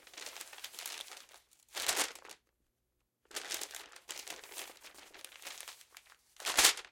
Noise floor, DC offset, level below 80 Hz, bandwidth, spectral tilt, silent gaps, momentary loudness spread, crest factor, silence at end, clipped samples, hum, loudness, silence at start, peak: -83 dBFS; under 0.1%; -72 dBFS; 17 kHz; 2 dB/octave; none; 22 LU; 32 dB; 0.05 s; under 0.1%; none; -36 LUFS; 0.05 s; -8 dBFS